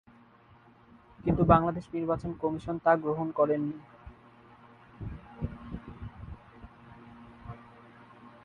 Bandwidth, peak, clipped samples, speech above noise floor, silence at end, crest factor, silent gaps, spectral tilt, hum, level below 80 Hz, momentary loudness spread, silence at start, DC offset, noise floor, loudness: 9.4 kHz; -8 dBFS; under 0.1%; 31 dB; 0.15 s; 24 dB; none; -9.5 dB/octave; none; -48 dBFS; 27 LU; 1.2 s; under 0.1%; -58 dBFS; -29 LUFS